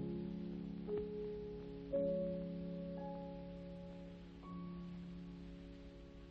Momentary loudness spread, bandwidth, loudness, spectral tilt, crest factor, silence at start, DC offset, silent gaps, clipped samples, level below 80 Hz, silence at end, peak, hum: 14 LU; 6 kHz; -46 LUFS; -9.5 dB/octave; 16 dB; 0 s; under 0.1%; none; under 0.1%; -60 dBFS; 0 s; -28 dBFS; none